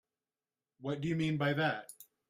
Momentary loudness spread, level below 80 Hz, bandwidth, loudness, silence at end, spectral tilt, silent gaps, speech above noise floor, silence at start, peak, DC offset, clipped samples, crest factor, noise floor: 13 LU; -70 dBFS; 15.5 kHz; -34 LUFS; 0.25 s; -6.5 dB/octave; none; over 56 dB; 0.8 s; -20 dBFS; under 0.1%; under 0.1%; 18 dB; under -90 dBFS